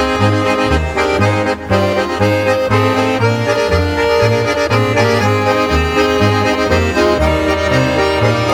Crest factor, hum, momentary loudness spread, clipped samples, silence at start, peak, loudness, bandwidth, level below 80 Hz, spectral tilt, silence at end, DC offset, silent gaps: 12 dB; none; 2 LU; under 0.1%; 0 s; 0 dBFS; -13 LUFS; 16.5 kHz; -28 dBFS; -5.5 dB/octave; 0 s; under 0.1%; none